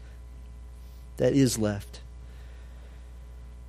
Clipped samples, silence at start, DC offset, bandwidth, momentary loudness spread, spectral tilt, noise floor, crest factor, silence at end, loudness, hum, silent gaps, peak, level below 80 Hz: under 0.1%; 0 s; under 0.1%; 15 kHz; 24 LU; -5.5 dB/octave; -44 dBFS; 22 dB; 0 s; -26 LUFS; none; none; -10 dBFS; -44 dBFS